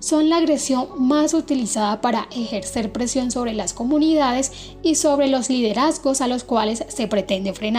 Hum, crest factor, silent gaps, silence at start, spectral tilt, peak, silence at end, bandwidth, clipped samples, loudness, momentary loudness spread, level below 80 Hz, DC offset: none; 14 dB; none; 0 s; -3.5 dB/octave; -6 dBFS; 0 s; 16 kHz; under 0.1%; -20 LUFS; 7 LU; -46 dBFS; under 0.1%